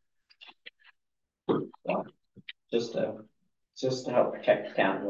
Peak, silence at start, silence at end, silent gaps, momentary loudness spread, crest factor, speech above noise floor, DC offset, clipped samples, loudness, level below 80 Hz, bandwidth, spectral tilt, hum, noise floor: -10 dBFS; 0.4 s; 0 s; none; 22 LU; 22 dB; 56 dB; under 0.1%; under 0.1%; -30 LUFS; -78 dBFS; 7.8 kHz; -5.5 dB/octave; none; -84 dBFS